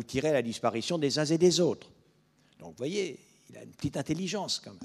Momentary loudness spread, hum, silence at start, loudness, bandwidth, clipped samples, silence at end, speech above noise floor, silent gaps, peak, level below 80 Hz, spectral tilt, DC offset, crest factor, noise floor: 19 LU; none; 0 s; -30 LUFS; 14 kHz; under 0.1%; 0 s; 36 dB; none; -12 dBFS; -62 dBFS; -4.5 dB/octave; under 0.1%; 20 dB; -66 dBFS